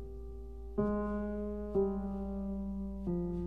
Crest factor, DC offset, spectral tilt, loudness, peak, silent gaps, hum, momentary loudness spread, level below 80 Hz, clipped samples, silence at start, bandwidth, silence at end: 16 dB; 0.2%; -11 dB/octave; -37 LUFS; -20 dBFS; none; none; 13 LU; -46 dBFS; under 0.1%; 0 s; 3.4 kHz; 0 s